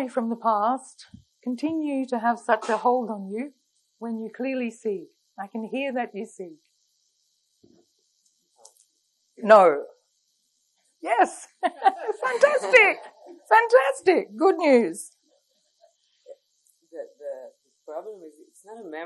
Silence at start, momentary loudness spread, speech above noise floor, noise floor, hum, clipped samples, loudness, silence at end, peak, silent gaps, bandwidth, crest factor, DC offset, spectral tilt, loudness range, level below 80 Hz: 0 s; 22 LU; 48 dB; -71 dBFS; none; under 0.1%; -22 LUFS; 0 s; -2 dBFS; none; 12 kHz; 22 dB; under 0.1%; -4 dB/octave; 17 LU; -78 dBFS